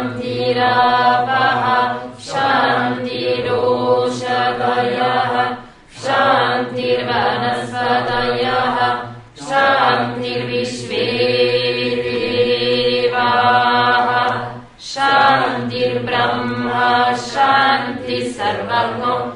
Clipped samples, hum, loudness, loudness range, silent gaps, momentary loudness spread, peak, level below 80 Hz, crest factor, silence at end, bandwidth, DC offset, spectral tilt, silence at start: under 0.1%; none; -16 LUFS; 2 LU; none; 8 LU; 0 dBFS; -50 dBFS; 16 dB; 0 s; 10.5 kHz; under 0.1%; -4.5 dB/octave; 0 s